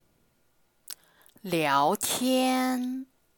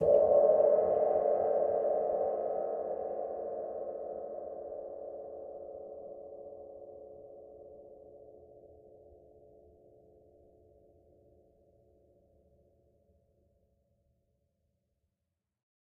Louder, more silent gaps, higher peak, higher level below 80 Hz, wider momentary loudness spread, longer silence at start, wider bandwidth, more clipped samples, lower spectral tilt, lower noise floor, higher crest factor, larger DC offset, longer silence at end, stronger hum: first, -26 LUFS vs -31 LUFS; neither; first, -10 dBFS vs -14 dBFS; about the same, -72 dBFS vs -70 dBFS; second, 19 LU vs 27 LU; first, 0.9 s vs 0 s; first, 19.5 kHz vs 2.2 kHz; neither; second, -3.5 dB/octave vs -8.5 dB/octave; second, -68 dBFS vs -87 dBFS; about the same, 18 dB vs 22 dB; neither; second, 0.35 s vs 7.15 s; neither